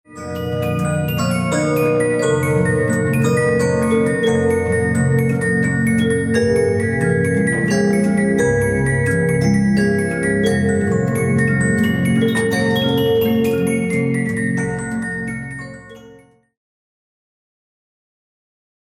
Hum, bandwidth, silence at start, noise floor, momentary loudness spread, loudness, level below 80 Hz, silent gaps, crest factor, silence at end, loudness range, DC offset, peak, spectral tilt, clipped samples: none; 16 kHz; 0.1 s; -46 dBFS; 6 LU; -17 LUFS; -44 dBFS; none; 14 dB; 2.7 s; 7 LU; under 0.1%; -4 dBFS; -6 dB/octave; under 0.1%